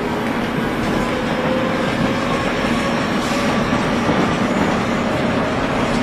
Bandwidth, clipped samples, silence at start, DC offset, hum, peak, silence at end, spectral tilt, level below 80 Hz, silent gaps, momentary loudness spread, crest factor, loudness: 14 kHz; under 0.1%; 0 s; under 0.1%; none; -6 dBFS; 0 s; -5.5 dB/octave; -36 dBFS; none; 2 LU; 12 dB; -18 LUFS